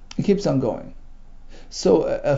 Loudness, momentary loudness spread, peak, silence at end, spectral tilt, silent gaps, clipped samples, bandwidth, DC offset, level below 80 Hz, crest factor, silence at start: -21 LUFS; 13 LU; -4 dBFS; 0 s; -6.5 dB/octave; none; under 0.1%; 7.8 kHz; under 0.1%; -40 dBFS; 18 dB; 0 s